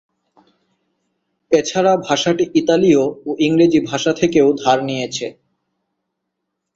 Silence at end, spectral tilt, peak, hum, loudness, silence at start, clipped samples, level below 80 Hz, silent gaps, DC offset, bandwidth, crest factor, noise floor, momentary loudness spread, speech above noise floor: 1.45 s; -5 dB/octave; -2 dBFS; none; -16 LUFS; 1.5 s; under 0.1%; -56 dBFS; none; under 0.1%; 7.8 kHz; 16 dB; -76 dBFS; 9 LU; 61 dB